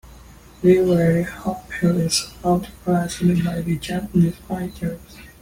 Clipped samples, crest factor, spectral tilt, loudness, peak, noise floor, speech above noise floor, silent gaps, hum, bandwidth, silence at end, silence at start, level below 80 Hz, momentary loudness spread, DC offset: under 0.1%; 16 dB; -6 dB/octave; -21 LUFS; -4 dBFS; -44 dBFS; 24 dB; none; none; 16.5 kHz; 0.15 s; 0.05 s; -44 dBFS; 12 LU; under 0.1%